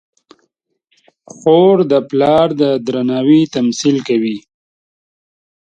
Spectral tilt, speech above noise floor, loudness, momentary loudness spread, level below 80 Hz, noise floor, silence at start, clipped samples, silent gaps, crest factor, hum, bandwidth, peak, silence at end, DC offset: -6 dB/octave; 54 dB; -13 LUFS; 7 LU; -56 dBFS; -66 dBFS; 1.45 s; under 0.1%; none; 14 dB; none; 9 kHz; 0 dBFS; 1.35 s; under 0.1%